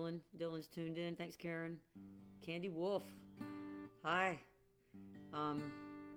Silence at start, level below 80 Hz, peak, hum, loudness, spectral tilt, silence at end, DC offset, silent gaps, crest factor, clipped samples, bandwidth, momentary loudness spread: 0 s; -80 dBFS; -24 dBFS; none; -45 LUFS; -6 dB/octave; 0 s; under 0.1%; none; 22 dB; under 0.1%; over 20 kHz; 18 LU